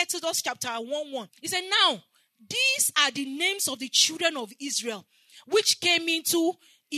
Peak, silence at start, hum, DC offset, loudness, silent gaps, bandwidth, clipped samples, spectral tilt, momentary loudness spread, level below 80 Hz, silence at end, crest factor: -6 dBFS; 0 s; none; under 0.1%; -24 LUFS; none; 13.5 kHz; under 0.1%; 0 dB/octave; 13 LU; -86 dBFS; 0 s; 22 dB